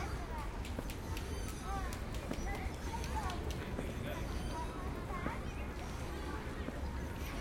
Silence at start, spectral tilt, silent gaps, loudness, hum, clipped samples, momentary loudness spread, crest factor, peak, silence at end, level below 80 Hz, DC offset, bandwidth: 0 s; -5.5 dB/octave; none; -42 LUFS; none; under 0.1%; 3 LU; 16 dB; -24 dBFS; 0 s; -44 dBFS; under 0.1%; 16.5 kHz